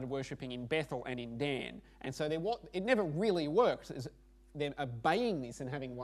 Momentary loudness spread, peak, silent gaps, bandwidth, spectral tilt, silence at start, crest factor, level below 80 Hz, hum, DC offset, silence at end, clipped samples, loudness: 14 LU; -14 dBFS; none; 13.5 kHz; -6 dB/octave; 0 s; 22 dB; -62 dBFS; none; under 0.1%; 0 s; under 0.1%; -36 LUFS